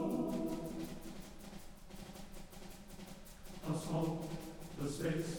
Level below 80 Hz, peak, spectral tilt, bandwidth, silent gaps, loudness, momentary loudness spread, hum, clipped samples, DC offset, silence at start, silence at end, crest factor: -56 dBFS; -26 dBFS; -6 dB/octave; over 20 kHz; none; -43 LUFS; 15 LU; none; under 0.1%; under 0.1%; 0 s; 0 s; 16 dB